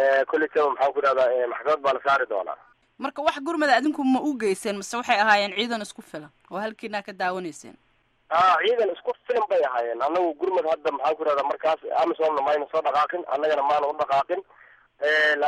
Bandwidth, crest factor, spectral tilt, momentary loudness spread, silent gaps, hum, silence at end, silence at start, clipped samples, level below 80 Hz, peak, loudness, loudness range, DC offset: 13 kHz; 18 dB; -3.5 dB/octave; 12 LU; none; none; 0 s; 0 s; under 0.1%; -70 dBFS; -6 dBFS; -24 LUFS; 3 LU; under 0.1%